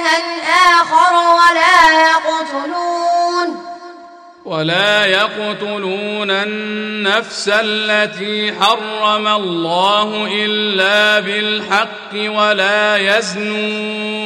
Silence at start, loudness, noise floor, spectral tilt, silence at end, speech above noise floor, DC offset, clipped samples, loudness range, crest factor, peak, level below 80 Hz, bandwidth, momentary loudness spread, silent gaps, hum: 0 s; -13 LUFS; -38 dBFS; -3 dB/octave; 0 s; 22 dB; under 0.1%; under 0.1%; 5 LU; 14 dB; 0 dBFS; -54 dBFS; 15.5 kHz; 11 LU; none; none